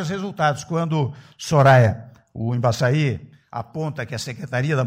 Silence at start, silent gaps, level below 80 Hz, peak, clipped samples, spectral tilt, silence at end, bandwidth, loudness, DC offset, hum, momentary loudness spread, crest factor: 0 s; none; -54 dBFS; -6 dBFS; under 0.1%; -6.5 dB/octave; 0 s; 15 kHz; -21 LUFS; under 0.1%; none; 19 LU; 16 dB